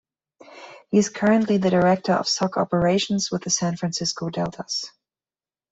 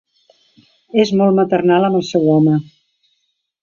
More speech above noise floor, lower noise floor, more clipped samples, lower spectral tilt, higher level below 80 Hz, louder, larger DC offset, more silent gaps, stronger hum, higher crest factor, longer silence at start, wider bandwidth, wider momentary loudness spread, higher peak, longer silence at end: first, over 68 dB vs 55 dB; first, under -90 dBFS vs -68 dBFS; neither; second, -4.5 dB/octave vs -7.5 dB/octave; about the same, -56 dBFS vs -60 dBFS; second, -22 LUFS vs -14 LUFS; neither; neither; neither; about the same, 16 dB vs 14 dB; second, 0.5 s vs 0.95 s; first, 8.2 kHz vs 7.2 kHz; first, 9 LU vs 4 LU; second, -6 dBFS vs -2 dBFS; second, 0.85 s vs 1 s